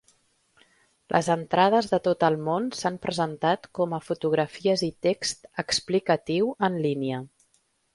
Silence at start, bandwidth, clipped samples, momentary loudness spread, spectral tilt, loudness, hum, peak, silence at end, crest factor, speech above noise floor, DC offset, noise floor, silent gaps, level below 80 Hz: 1.1 s; 11.5 kHz; under 0.1%; 7 LU; -5 dB/octave; -26 LUFS; none; -4 dBFS; 0.7 s; 22 dB; 44 dB; under 0.1%; -69 dBFS; none; -64 dBFS